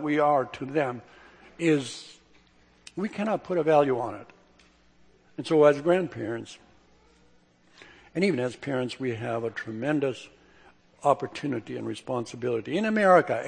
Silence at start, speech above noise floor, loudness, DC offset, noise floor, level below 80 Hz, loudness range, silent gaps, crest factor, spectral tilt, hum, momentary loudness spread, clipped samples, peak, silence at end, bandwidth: 0 s; 35 dB; -27 LUFS; under 0.1%; -61 dBFS; -68 dBFS; 5 LU; none; 22 dB; -6 dB/octave; none; 17 LU; under 0.1%; -6 dBFS; 0 s; 9.8 kHz